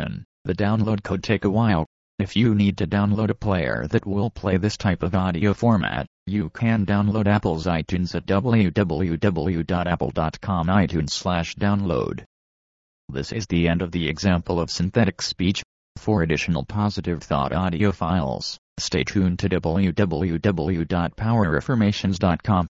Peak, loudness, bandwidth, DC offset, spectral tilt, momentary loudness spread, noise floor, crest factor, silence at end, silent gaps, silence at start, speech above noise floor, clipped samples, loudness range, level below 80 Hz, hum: -6 dBFS; -23 LUFS; 8 kHz; under 0.1%; -6.5 dB/octave; 7 LU; under -90 dBFS; 16 dB; 0.05 s; 0.25-0.45 s, 1.86-2.18 s, 6.07-6.26 s, 12.26-13.08 s, 15.65-15.95 s, 18.58-18.76 s; 0 s; over 68 dB; under 0.1%; 2 LU; -42 dBFS; none